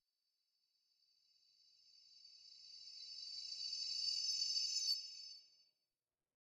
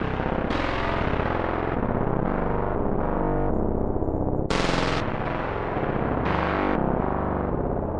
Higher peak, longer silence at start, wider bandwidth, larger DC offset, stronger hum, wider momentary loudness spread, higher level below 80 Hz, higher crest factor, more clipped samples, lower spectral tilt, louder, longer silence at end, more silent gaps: second, -28 dBFS vs -6 dBFS; first, 1.85 s vs 0 s; first, 16.5 kHz vs 10 kHz; neither; neither; first, 22 LU vs 3 LU; second, under -90 dBFS vs -32 dBFS; about the same, 20 dB vs 18 dB; neither; second, 5 dB/octave vs -7 dB/octave; second, -40 LUFS vs -26 LUFS; first, 1.05 s vs 0 s; neither